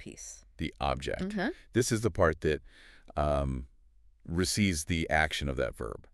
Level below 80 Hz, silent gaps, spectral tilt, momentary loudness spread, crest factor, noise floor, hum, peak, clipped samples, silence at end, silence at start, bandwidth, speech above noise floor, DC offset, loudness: -44 dBFS; none; -4.5 dB/octave; 12 LU; 20 dB; -61 dBFS; none; -10 dBFS; under 0.1%; 0.15 s; 0 s; 13.5 kHz; 30 dB; under 0.1%; -31 LUFS